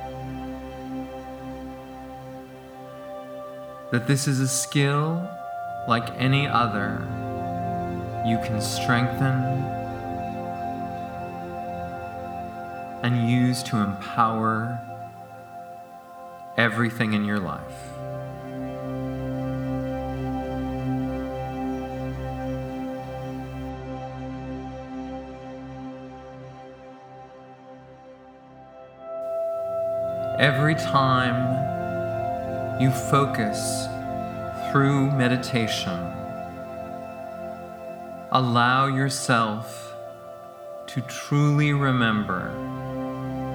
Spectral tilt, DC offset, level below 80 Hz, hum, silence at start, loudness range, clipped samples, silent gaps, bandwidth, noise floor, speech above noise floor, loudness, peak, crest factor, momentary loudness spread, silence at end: -5.5 dB/octave; under 0.1%; -48 dBFS; none; 0 s; 12 LU; under 0.1%; none; over 20 kHz; -47 dBFS; 24 dB; -26 LUFS; 0 dBFS; 26 dB; 19 LU; 0 s